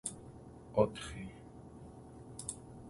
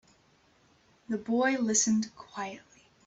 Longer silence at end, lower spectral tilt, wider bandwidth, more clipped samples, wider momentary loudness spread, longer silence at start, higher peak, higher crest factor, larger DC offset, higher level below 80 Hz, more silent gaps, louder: second, 0 s vs 0.45 s; first, -5 dB/octave vs -3 dB/octave; first, 11.5 kHz vs 8.2 kHz; neither; first, 20 LU vs 14 LU; second, 0.05 s vs 1.1 s; about the same, -14 dBFS vs -14 dBFS; first, 28 dB vs 20 dB; neither; first, -58 dBFS vs -72 dBFS; neither; second, -38 LUFS vs -29 LUFS